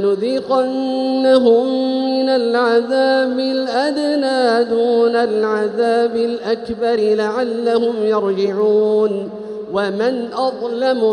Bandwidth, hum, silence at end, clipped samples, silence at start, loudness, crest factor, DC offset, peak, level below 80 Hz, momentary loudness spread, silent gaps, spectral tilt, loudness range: 10.5 kHz; none; 0 s; under 0.1%; 0 s; -16 LUFS; 16 dB; under 0.1%; 0 dBFS; -60 dBFS; 6 LU; none; -5.5 dB/octave; 2 LU